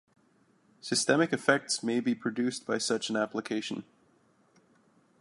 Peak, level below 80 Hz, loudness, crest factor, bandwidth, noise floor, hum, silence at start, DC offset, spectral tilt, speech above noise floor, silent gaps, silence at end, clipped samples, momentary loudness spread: -8 dBFS; -78 dBFS; -30 LUFS; 24 dB; 11.5 kHz; -67 dBFS; none; 0.85 s; under 0.1%; -3.5 dB/octave; 37 dB; none; 1.4 s; under 0.1%; 9 LU